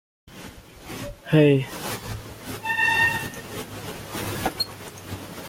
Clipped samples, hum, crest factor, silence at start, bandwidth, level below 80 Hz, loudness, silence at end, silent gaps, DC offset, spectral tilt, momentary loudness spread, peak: under 0.1%; none; 20 dB; 0.25 s; 17 kHz; -50 dBFS; -24 LUFS; 0 s; none; under 0.1%; -5 dB/octave; 20 LU; -6 dBFS